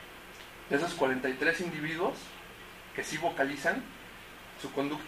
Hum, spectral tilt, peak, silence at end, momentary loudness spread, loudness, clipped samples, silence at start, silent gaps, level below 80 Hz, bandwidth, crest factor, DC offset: none; -4 dB/octave; -14 dBFS; 0 s; 18 LU; -32 LUFS; under 0.1%; 0 s; none; -62 dBFS; 15.5 kHz; 20 dB; under 0.1%